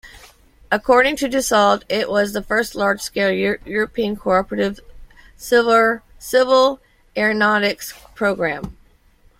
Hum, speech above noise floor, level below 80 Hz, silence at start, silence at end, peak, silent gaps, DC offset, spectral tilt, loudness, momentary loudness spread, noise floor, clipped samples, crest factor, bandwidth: none; 35 dB; -46 dBFS; 0.05 s; 0.65 s; -2 dBFS; none; under 0.1%; -3.5 dB/octave; -18 LUFS; 13 LU; -53 dBFS; under 0.1%; 18 dB; 16.5 kHz